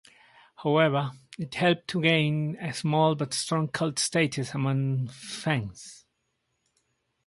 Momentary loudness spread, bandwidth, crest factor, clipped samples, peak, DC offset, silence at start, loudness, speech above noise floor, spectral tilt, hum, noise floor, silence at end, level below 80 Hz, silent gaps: 12 LU; 11.5 kHz; 20 dB; under 0.1%; -8 dBFS; under 0.1%; 0.6 s; -27 LUFS; 51 dB; -5 dB/octave; none; -77 dBFS; 1.3 s; -66 dBFS; none